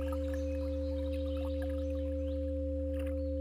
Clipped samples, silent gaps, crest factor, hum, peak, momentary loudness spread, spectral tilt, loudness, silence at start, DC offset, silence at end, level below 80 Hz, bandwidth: under 0.1%; none; 10 dB; none; -26 dBFS; 0 LU; -8.5 dB/octave; -36 LUFS; 0 s; under 0.1%; 0 s; -38 dBFS; 11 kHz